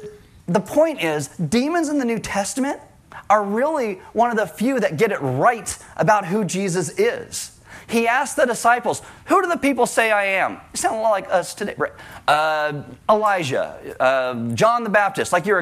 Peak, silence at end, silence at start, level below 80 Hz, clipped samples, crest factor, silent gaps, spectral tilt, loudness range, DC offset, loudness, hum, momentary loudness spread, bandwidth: -6 dBFS; 0 s; 0 s; -56 dBFS; under 0.1%; 14 dB; none; -4.5 dB/octave; 2 LU; under 0.1%; -20 LUFS; none; 9 LU; 15.5 kHz